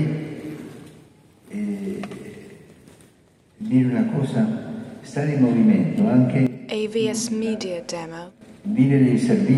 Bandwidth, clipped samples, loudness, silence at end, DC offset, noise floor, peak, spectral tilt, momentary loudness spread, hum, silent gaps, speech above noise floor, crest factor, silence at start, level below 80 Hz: 12 kHz; under 0.1%; -21 LUFS; 0 s; under 0.1%; -56 dBFS; -6 dBFS; -7 dB/octave; 18 LU; none; none; 37 dB; 16 dB; 0 s; -62 dBFS